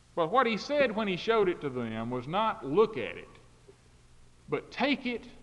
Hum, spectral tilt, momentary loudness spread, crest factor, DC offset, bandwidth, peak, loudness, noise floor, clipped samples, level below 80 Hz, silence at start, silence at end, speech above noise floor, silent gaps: 60 Hz at -65 dBFS; -6 dB/octave; 10 LU; 20 dB; under 0.1%; 10.5 kHz; -12 dBFS; -30 LUFS; -57 dBFS; under 0.1%; -60 dBFS; 0.15 s; 0 s; 28 dB; none